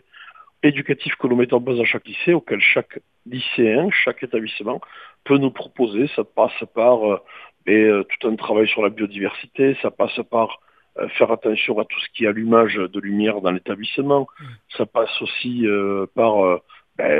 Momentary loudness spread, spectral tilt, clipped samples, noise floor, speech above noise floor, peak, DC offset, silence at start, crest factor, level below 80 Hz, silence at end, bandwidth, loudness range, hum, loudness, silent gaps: 11 LU; -8 dB/octave; under 0.1%; -45 dBFS; 25 dB; 0 dBFS; under 0.1%; 0.2 s; 20 dB; -66 dBFS; 0 s; 4.9 kHz; 2 LU; none; -19 LUFS; none